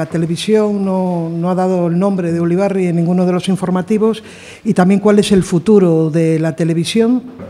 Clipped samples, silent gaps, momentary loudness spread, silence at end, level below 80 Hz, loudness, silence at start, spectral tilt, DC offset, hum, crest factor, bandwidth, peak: under 0.1%; none; 7 LU; 0 s; -48 dBFS; -14 LUFS; 0 s; -7 dB/octave; under 0.1%; none; 14 dB; 12.5 kHz; 0 dBFS